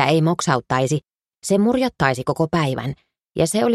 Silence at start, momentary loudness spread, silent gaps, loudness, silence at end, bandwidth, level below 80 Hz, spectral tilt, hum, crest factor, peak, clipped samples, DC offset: 0 s; 12 LU; none; -20 LUFS; 0 s; 13.5 kHz; -50 dBFS; -5.5 dB/octave; none; 20 dB; 0 dBFS; under 0.1%; under 0.1%